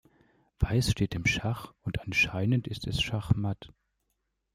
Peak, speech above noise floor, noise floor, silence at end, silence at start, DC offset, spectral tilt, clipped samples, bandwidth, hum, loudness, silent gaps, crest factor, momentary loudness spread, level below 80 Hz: -10 dBFS; 51 dB; -80 dBFS; 0.9 s; 0.6 s; under 0.1%; -5 dB/octave; under 0.1%; 15.5 kHz; none; -29 LUFS; none; 22 dB; 10 LU; -44 dBFS